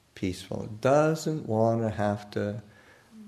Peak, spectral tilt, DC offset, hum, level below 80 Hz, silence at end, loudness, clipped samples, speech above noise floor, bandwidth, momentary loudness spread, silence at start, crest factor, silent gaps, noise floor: -10 dBFS; -6.5 dB/octave; under 0.1%; none; -60 dBFS; 0 s; -28 LUFS; under 0.1%; 25 dB; 13.5 kHz; 12 LU; 0.15 s; 18 dB; none; -52 dBFS